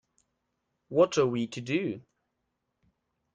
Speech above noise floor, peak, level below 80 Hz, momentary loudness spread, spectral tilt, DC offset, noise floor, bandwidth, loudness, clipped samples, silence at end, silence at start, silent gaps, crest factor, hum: 54 dB; -10 dBFS; -72 dBFS; 11 LU; -5.5 dB/octave; under 0.1%; -81 dBFS; 9.2 kHz; -28 LUFS; under 0.1%; 1.35 s; 0.9 s; none; 20 dB; none